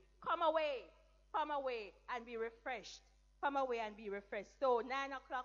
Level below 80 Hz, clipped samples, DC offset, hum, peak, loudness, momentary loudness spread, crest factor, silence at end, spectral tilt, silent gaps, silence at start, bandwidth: -70 dBFS; under 0.1%; under 0.1%; none; -24 dBFS; -41 LUFS; 12 LU; 18 dB; 0 s; -3.5 dB/octave; none; 0.2 s; 7.6 kHz